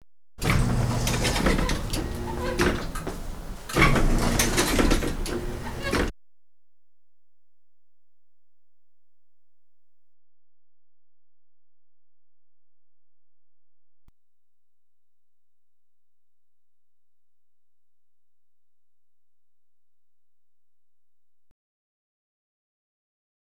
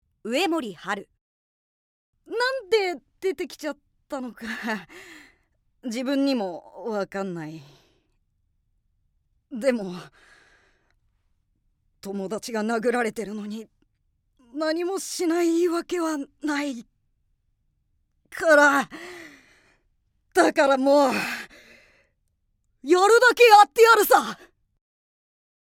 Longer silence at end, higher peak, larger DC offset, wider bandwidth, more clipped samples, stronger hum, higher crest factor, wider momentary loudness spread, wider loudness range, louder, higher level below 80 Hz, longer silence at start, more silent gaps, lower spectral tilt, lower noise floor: first, 2 s vs 1.35 s; about the same, -4 dBFS vs -2 dBFS; neither; first, over 20 kHz vs 18 kHz; neither; first, 60 Hz at -60 dBFS vs none; about the same, 26 dB vs 22 dB; second, 12 LU vs 23 LU; second, 11 LU vs 15 LU; second, -25 LUFS vs -22 LUFS; first, -34 dBFS vs -66 dBFS; second, 0 s vs 0.25 s; second, none vs 1.21-2.13 s; about the same, -4.5 dB/octave vs -3.5 dB/octave; first, under -90 dBFS vs -72 dBFS